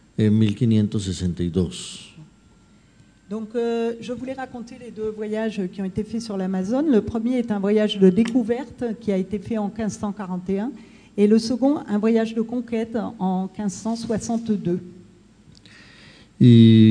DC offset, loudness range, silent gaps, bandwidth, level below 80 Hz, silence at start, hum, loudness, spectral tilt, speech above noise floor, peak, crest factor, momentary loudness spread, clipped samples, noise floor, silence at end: under 0.1%; 7 LU; none; 10 kHz; -52 dBFS; 0.2 s; none; -22 LUFS; -7.5 dB/octave; 33 dB; -2 dBFS; 20 dB; 13 LU; under 0.1%; -53 dBFS; 0 s